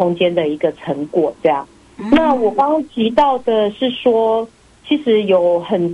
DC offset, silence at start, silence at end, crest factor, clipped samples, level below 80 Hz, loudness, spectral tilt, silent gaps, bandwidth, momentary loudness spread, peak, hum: under 0.1%; 0 s; 0 s; 14 dB; under 0.1%; -48 dBFS; -16 LUFS; -7 dB/octave; none; 11 kHz; 7 LU; -2 dBFS; none